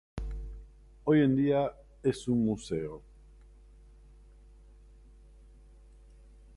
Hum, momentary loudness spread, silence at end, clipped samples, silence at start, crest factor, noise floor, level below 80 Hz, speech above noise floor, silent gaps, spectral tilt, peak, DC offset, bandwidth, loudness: none; 20 LU; 3.55 s; under 0.1%; 0.15 s; 18 dB; -55 dBFS; -48 dBFS; 27 dB; none; -7.5 dB/octave; -14 dBFS; under 0.1%; 11.5 kHz; -30 LUFS